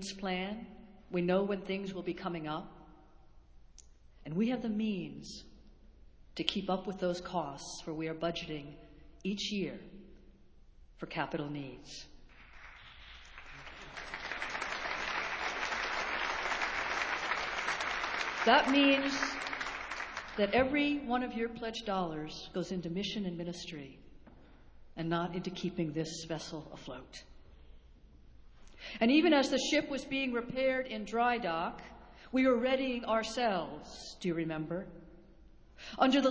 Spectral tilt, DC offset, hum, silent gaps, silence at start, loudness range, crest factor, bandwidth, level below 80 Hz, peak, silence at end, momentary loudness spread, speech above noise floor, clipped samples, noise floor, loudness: -4.5 dB/octave; under 0.1%; none; none; 0 s; 11 LU; 26 dB; 8 kHz; -60 dBFS; -10 dBFS; 0 s; 20 LU; 24 dB; under 0.1%; -58 dBFS; -34 LUFS